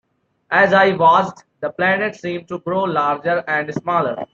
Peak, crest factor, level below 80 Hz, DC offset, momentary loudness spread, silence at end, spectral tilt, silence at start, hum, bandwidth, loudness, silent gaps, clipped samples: -2 dBFS; 16 dB; -62 dBFS; under 0.1%; 14 LU; 0.1 s; -6 dB/octave; 0.5 s; none; 7.4 kHz; -17 LUFS; none; under 0.1%